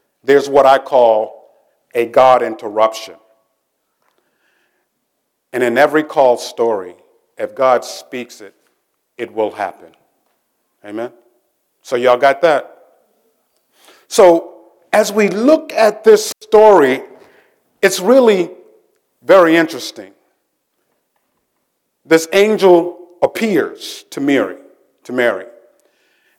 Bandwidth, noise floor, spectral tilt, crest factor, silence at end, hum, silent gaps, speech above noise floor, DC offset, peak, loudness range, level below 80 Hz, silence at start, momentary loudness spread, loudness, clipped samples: 17 kHz; -70 dBFS; -4 dB/octave; 16 dB; 0.95 s; none; none; 57 dB; under 0.1%; 0 dBFS; 9 LU; -62 dBFS; 0.25 s; 17 LU; -13 LUFS; under 0.1%